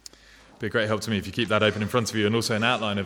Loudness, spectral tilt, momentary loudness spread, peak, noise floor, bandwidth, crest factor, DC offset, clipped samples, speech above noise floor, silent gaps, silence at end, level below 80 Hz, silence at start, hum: -24 LUFS; -4.5 dB/octave; 5 LU; -6 dBFS; -52 dBFS; 17.5 kHz; 20 dB; under 0.1%; under 0.1%; 28 dB; none; 0 s; -58 dBFS; 0.6 s; none